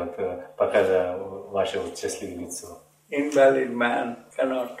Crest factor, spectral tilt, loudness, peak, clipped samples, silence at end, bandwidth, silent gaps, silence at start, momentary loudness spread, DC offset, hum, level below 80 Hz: 18 dB; -4 dB/octave; -25 LUFS; -6 dBFS; under 0.1%; 0 s; 15.5 kHz; none; 0 s; 15 LU; under 0.1%; none; -64 dBFS